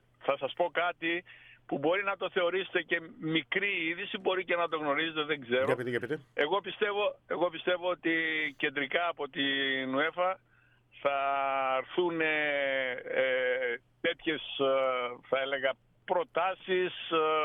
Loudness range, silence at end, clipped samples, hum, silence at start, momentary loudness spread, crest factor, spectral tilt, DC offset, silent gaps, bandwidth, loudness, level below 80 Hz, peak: 1 LU; 0 s; under 0.1%; none; 0.2 s; 5 LU; 18 dB; -6 dB/octave; under 0.1%; none; 8.8 kHz; -31 LUFS; -74 dBFS; -14 dBFS